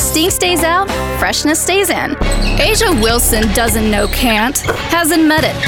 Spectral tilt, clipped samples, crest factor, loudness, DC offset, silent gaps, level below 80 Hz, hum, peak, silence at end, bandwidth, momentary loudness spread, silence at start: -3 dB/octave; under 0.1%; 12 dB; -12 LUFS; under 0.1%; none; -22 dBFS; none; -2 dBFS; 0 s; 19 kHz; 5 LU; 0 s